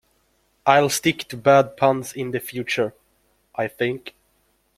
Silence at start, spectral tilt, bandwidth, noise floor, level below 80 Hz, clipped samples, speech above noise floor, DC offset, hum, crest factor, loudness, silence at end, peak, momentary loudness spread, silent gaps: 0.65 s; -4.5 dB/octave; 16 kHz; -65 dBFS; -62 dBFS; under 0.1%; 45 dB; under 0.1%; none; 20 dB; -21 LUFS; 0.7 s; -2 dBFS; 12 LU; none